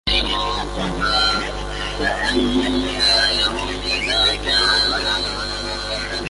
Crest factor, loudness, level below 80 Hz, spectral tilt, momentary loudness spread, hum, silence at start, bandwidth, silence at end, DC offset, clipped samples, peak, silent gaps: 16 dB; -18 LUFS; -32 dBFS; -3 dB/octave; 9 LU; 50 Hz at -30 dBFS; 0.05 s; 11.5 kHz; 0 s; under 0.1%; under 0.1%; -4 dBFS; none